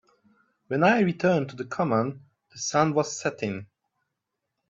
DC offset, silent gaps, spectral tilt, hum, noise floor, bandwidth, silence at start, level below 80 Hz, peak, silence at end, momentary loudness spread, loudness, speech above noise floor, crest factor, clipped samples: under 0.1%; none; -5.5 dB/octave; none; -83 dBFS; 8 kHz; 0.7 s; -68 dBFS; -6 dBFS; 1.05 s; 12 LU; -25 LUFS; 58 dB; 20 dB; under 0.1%